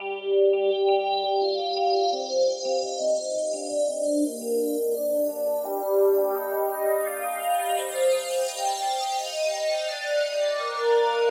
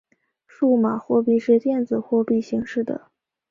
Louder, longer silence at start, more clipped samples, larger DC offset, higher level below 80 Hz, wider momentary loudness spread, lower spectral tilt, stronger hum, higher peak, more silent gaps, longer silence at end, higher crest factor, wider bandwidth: second, -25 LUFS vs -21 LUFS; second, 0 s vs 0.6 s; neither; neither; second, under -90 dBFS vs -64 dBFS; second, 5 LU vs 8 LU; second, -0.5 dB/octave vs -8 dB/octave; neither; second, -10 dBFS vs -6 dBFS; neither; second, 0 s vs 0.55 s; about the same, 14 dB vs 14 dB; first, 16 kHz vs 7.2 kHz